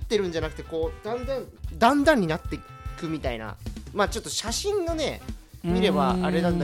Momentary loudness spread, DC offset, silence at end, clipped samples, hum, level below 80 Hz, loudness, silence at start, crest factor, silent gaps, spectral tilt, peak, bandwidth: 15 LU; under 0.1%; 0 s; under 0.1%; none; -40 dBFS; -26 LUFS; 0 s; 20 dB; none; -5 dB/octave; -6 dBFS; 16.5 kHz